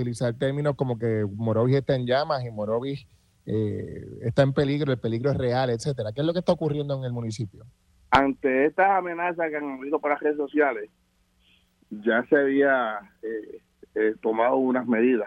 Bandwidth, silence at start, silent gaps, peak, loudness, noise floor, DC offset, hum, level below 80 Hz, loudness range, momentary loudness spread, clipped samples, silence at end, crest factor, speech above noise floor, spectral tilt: 11 kHz; 0 s; none; -4 dBFS; -25 LUFS; -64 dBFS; under 0.1%; none; -56 dBFS; 3 LU; 13 LU; under 0.1%; 0 s; 22 dB; 40 dB; -7 dB/octave